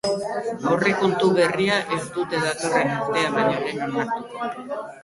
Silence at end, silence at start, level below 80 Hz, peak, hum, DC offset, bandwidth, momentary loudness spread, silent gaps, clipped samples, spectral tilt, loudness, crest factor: 0 s; 0.05 s; -60 dBFS; -6 dBFS; none; under 0.1%; 11.5 kHz; 9 LU; none; under 0.1%; -4.5 dB/octave; -23 LUFS; 16 dB